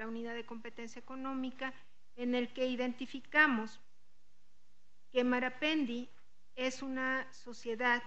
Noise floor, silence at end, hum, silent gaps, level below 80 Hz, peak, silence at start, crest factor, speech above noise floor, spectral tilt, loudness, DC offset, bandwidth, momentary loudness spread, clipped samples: -76 dBFS; 0 s; none; none; -80 dBFS; -14 dBFS; 0 s; 24 dB; 40 dB; -3.5 dB/octave; -35 LUFS; 0.5%; 8.4 kHz; 17 LU; under 0.1%